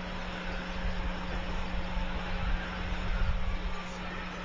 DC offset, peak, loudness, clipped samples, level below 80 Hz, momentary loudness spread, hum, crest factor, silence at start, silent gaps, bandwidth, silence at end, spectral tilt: under 0.1%; -18 dBFS; -36 LUFS; under 0.1%; -36 dBFS; 4 LU; none; 14 dB; 0 s; none; 7.6 kHz; 0 s; -5.5 dB/octave